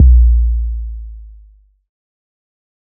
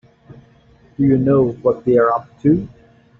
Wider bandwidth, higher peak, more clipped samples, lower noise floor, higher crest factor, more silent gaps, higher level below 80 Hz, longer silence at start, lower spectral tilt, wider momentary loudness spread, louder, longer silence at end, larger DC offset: second, 0.3 kHz vs 4 kHz; first, 0 dBFS vs -4 dBFS; neither; second, -46 dBFS vs -50 dBFS; about the same, 14 dB vs 14 dB; neither; first, -14 dBFS vs -48 dBFS; second, 0 s vs 1 s; first, -23.5 dB/octave vs -10 dB/octave; first, 24 LU vs 6 LU; about the same, -14 LUFS vs -16 LUFS; first, 1.7 s vs 0.55 s; neither